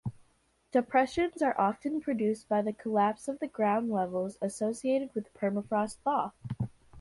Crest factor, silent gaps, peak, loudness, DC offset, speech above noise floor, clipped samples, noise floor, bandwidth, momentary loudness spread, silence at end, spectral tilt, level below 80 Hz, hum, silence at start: 18 dB; none; -14 dBFS; -31 LUFS; under 0.1%; 39 dB; under 0.1%; -69 dBFS; 11.5 kHz; 9 LU; 0 s; -6.5 dB/octave; -62 dBFS; none; 0.05 s